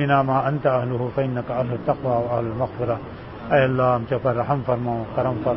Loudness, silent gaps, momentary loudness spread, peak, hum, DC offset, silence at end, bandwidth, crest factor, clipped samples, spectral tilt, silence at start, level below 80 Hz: -22 LUFS; none; 7 LU; -4 dBFS; none; 0.1%; 0 s; 5.8 kHz; 16 dB; under 0.1%; -12 dB/octave; 0 s; -48 dBFS